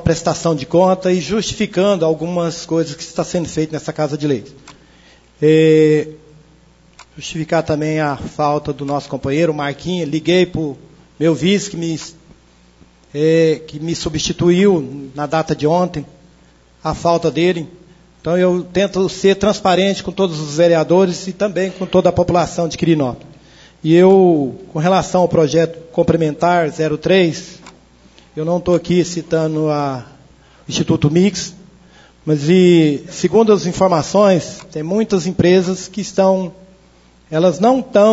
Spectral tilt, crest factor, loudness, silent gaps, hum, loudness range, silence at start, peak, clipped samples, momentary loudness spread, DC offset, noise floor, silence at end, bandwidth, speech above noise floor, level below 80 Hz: -6 dB/octave; 16 dB; -16 LUFS; none; none; 5 LU; 0 s; 0 dBFS; under 0.1%; 11 LU; under 0.1%; -49 dBFS; 0 s; 8 kHz; 34 dB; -46 dBFS